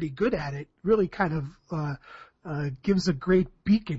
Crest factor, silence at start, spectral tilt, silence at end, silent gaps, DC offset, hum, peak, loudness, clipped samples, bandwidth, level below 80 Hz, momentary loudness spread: 16 dB; 0 s; -7.5 dB/octave; 0 s; none; under 0.1%; none; -10 dBFS; -27 LUFS; under 0.1%; 8 kHz; -48 dBFS; 11 LU